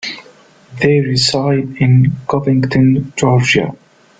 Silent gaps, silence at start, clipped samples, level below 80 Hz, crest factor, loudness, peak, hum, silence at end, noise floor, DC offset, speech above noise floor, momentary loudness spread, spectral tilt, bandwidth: none; 0.05 s; under 0.1%; -46 dBFS; 14 dB; -13 LUFS; 0 dBFS; none; 0.45 s; -44 dBFS; under 0.1%; 32 dB; 6 LU; -6 dB/octave; 9.2 kHz